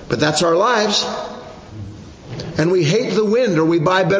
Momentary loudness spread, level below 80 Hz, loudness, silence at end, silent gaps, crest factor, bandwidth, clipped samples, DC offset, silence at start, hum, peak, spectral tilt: 19 LU; -48 dBFS; -16 LUFS; 0 s; none; 14 dB; 8 kHz; under 0.1%; under 0.1%; 0 s; none; -2 dBFS; -5 dB/octave